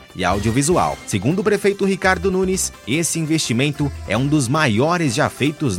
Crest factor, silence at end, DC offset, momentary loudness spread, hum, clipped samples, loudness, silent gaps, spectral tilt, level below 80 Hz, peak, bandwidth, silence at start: 16 dB; 0 s; under 0.1%; 4 LU; none; under 0.1%; -18 LUFS; none; -4.5 dB/octave; -40 dBFS; -2 dBFS; 16.5 kHz; 0 s